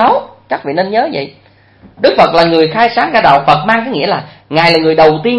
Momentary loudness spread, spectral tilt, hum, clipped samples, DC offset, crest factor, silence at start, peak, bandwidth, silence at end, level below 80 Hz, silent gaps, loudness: 10 LU; -6.5 dB/octave; none; 0.4%; under 0.1%; 10 dB; 0 s; 0 dBFS; 11 kHz; 0 s; -46 dBFS; none; -10 LUFS